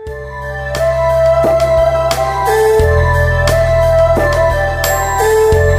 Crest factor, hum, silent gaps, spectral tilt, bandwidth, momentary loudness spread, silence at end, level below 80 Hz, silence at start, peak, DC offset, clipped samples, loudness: 12 dB; none; none; -5 dB/octave; 16 kHz; 6 LU; 0 s; -22 dBFS; 0 s; 0 dBFS; under 0.1%; under 0.1%; -12 LUFS